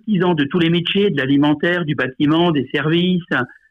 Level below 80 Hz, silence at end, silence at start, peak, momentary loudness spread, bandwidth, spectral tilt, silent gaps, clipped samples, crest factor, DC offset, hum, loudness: -56 dBFS; 0.25 s; 0.05 s; -8 dBFS; 4 LU; 5.6 kHz; -8 dB/octave; none; under 0.1%; 10 dB; under 0.1%; none; -17 LUFS